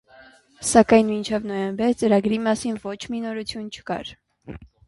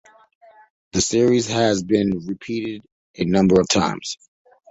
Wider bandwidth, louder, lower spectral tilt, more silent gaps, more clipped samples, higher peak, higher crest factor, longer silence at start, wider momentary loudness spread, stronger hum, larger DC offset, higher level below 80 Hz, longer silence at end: first, 11.5 kHz vs 8 kHz; about the same, -22 LUFS vs -20 LUFS; about the same, -4.5 dB/octave vs -4.5 dB/octave; second, none vs 2.92-3.14 s; neither; about the same, -2 dBFS vs -2 dBFS; about the same, 22 dB vs 18 dB; second, 0.2 s vs 0.95 s; about the same, 17 LU vs 15 LU; neither; neither; about the same, -52 dBFS vs -48 dBFS; second, 0.25 s vs 0.55 s